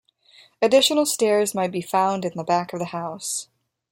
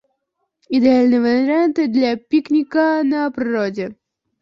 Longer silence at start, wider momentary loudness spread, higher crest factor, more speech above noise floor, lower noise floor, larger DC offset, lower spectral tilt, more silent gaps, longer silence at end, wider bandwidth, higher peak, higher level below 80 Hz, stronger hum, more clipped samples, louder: about the same, 0.6 s vs 0.7 s; first, 12 LU vs 8 LU; about the same, 18 dB vs 14 dB; second, 33 dB vs 57 dB; second, -54 dBFS vs -73 dBFS; neither; second, -3 dB/octave vs -6.5 dB/octave; neither; about the same, 0.5 s vs 0.5 s; first, 16.5 kHz vs 7 kHz; about the same, -4 dBFS vs -2 dBFS; second, -70 dBFS vs -60 dBFS; neither; neither; second, -22 LUFS vs -17 LUFS